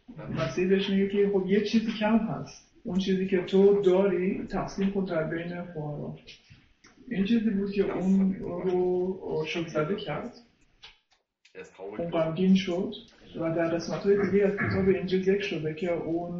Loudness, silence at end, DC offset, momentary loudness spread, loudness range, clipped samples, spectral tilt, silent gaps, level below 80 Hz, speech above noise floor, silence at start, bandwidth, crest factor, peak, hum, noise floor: -27 LUFS; 0 s; under 0.1%; 13 LU; 6 LU; under 0.1%; -7 dB/octave; none; -56 dBFS; 44 dB; 0.1 s; 7 kHz; 16 dB; -10 dBFS; none; -70 dBFS